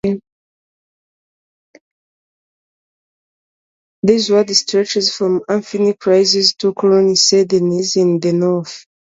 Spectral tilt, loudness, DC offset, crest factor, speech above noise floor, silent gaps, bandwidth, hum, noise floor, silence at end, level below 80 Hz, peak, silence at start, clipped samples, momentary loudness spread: -4 dB/octave; -14 LUFS; under 0.1%; 16 dB; over 76 dB; 0.32-1.74 s, 1.81-4.03 s; 7.8 kHz; none; under -90 dBFS; 0.3 s; -58 dBFS; 0 dBFS; 0.05 s; under 0.1%; 8 LU